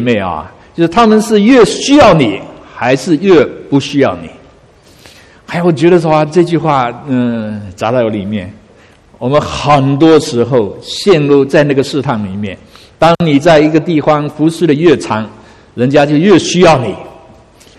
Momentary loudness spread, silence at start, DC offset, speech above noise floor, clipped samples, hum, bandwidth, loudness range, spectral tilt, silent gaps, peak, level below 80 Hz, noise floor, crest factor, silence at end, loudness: 14 LU; 0 s; under 0.1%; 33 dB; 0.7%; none; 13 kHz; 4 LU; -6 dB/octave; none; 0 dBFS; -40 dBFS; -42 dBFS; 10 dB; 0.7 s; -10 LUFS